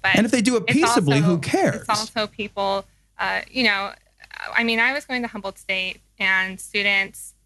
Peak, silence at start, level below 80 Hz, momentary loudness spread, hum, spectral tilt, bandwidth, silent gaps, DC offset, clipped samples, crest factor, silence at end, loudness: -4 dBFS; 0.05 s; -56 dBFS; 11 LU; none; -4 dB/octave; 12 kHz; none; under 0.1%; under 0.1%; 18 dB; 0.15 s; -21 LUFS